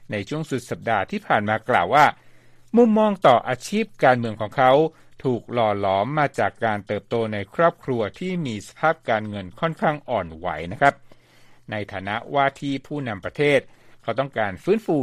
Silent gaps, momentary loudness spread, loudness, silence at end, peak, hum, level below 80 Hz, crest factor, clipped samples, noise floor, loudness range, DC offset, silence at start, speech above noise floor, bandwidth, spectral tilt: none; 12 LU; -22 LUFS; 0 s; -2 dBFS; none; -56 dBFS; 20 dB; under 0.1%; -50 dBFS; 6 LU; under 0.1%; 0 s; 29 dB; 14 kHz; -6 dB/octave